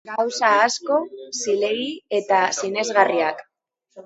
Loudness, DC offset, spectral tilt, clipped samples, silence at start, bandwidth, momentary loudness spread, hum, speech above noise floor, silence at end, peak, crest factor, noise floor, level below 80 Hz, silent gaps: -21 LUFS; under 0.1%; -2 dB/octave; under 0.1%; 0.05 s; 8.2 kHz; 9 LU; none; 31 dB; 0.05 s; -2 dBFS; 20 dB; -52 dBFS; -76 dBFS; none